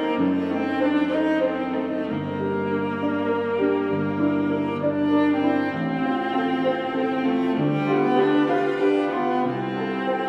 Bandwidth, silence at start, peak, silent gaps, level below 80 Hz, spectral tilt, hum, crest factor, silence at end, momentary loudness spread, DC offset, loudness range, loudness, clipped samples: 6.2 kHz; 0 s; -8 dBFS; none; -68 dBFS; -8 dB/octave; none; 14 dB; 0 s; 6 LU; under 0.1%; 2 LU; -23 LUFS; under 0.1%